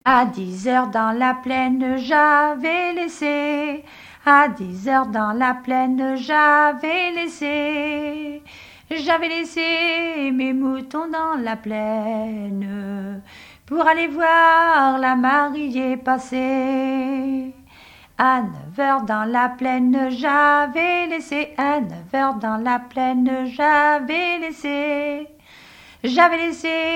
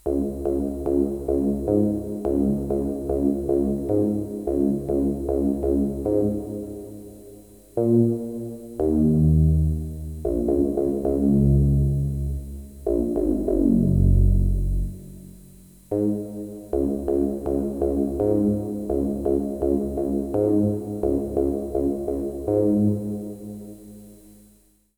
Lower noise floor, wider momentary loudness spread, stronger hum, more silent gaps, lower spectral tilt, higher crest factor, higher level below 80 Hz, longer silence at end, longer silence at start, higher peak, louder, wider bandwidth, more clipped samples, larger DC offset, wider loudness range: second, -47 dBFS vs -58 dBFS; about the same, 12 LU vs 13 LU; neither; neither; second, -5 dB/octave vs -11 dB/octave; first, 20 dB vs 14 dB; second, -58 dBFS vs -32 dBFS; second, 0 s vs 0.8 s; about the same, 0.05 s vs 0.05 s; first, 0 dBFS vs -8 dBFS; first, -19 LUFS vs -23 LUFS; second, 13 kHz vs over 20 kHz; neither; neither; about the same, 5 LU vs 4 LU